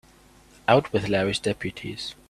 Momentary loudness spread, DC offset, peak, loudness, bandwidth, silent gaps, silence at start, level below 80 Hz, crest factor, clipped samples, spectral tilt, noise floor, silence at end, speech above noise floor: 12 LU; under 0.1%; -2 dBFS; -25 LUFS; 14 kHz; none; 0.7 s; -54 dBFS; 24 dB; under 0.1%; -5 dB/octave; -54 dBFS; 0.15 s; 30 dB